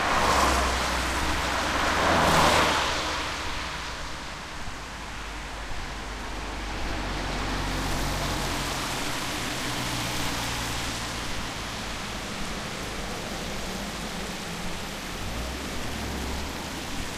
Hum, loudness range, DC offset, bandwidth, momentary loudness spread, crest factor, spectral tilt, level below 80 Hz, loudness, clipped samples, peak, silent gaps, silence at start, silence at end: none; 9 LU; under 0.1%; 15.5 kHz; 13 LU; 20 dB; -3 dB/octave; -38 dBFS; -28 LUFS; under 0.1%; -8 dBFS; none; 0 s; 0 s